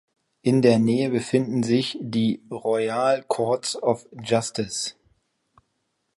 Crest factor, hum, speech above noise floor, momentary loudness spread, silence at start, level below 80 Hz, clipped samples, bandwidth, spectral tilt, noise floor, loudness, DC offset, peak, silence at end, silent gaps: 20 dB; none; 52 dB; 9 LU; 0.45 s; -64 dBFS; under 0.1%; 11.5 kHz; -5.5 dB/octave; -75 dBFS; -23 LUFS; under 0.1%; -4 dBFS; 1.25 s; none